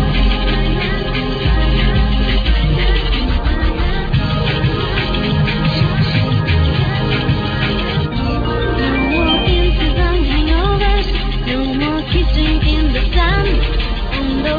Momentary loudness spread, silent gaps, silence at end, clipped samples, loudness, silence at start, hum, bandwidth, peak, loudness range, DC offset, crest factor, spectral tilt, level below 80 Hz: 3 LU; none; 0 s; under 0.1%; -16 LUFS; 0 s; none; 5 kHz; -2 dBFS; 1 LU; under 0.1%; 12 dB; -8 dB/octave; -18 dBFS